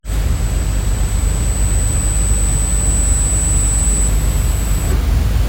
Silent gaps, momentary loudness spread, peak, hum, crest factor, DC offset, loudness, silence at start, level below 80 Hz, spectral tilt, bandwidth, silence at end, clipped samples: none; 4 LU; -2 dBFS; none; 12 dB; under 0.1%; -16 LUFS; 0.05 s; -16 dBFS; -4 dB/octave; 16.5 kHz; 0 s; under 0.1%